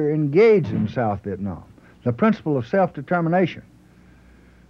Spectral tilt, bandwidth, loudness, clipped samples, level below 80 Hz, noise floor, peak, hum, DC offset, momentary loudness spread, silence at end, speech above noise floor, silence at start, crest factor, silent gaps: -9 dB/octave; 6.6 kHz; -21 LUFS; under 0.1%; -54 dBFS; -50 dBFS; -6 dBFS; none; under 0.1%; 14 LU; 1.1 s; 30 dB; 0 s; 16 dB; none